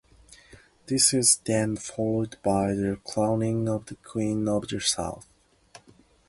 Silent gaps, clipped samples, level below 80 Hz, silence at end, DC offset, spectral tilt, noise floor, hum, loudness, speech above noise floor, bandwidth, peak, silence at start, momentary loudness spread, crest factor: none; under 0.1%; -54 dBFS; 0.5 s; under 0.1%; -4 dB/octave; -58 dBFS; none; -25 LUFS; 32 dB; 12 kHz; -6 dBFS; 0.9 s; 10 LU; 22 dB